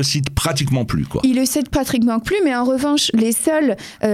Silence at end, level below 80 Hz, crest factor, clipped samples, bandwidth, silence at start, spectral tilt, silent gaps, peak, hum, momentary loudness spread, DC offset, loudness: 0 s; -38 dBFS; 16 dB; under 0.1%; 16 kHz; 0 s; -4.5 dB/octave; none; -2 dBFS; none; 3 LU; under 0.1%; -18 LUFS